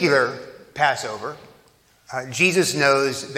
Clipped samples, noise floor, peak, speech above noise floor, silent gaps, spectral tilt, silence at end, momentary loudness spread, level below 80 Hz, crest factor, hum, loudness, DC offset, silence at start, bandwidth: under 0.1%; -57 dBFS; -2 dBFS; 36 dB; none; -3.5 dB/octave; 0 s; 16 LU; -66 dBFS; 20 dB; none; -20 LUFS; under 0.1%; 0 s; 16 kHz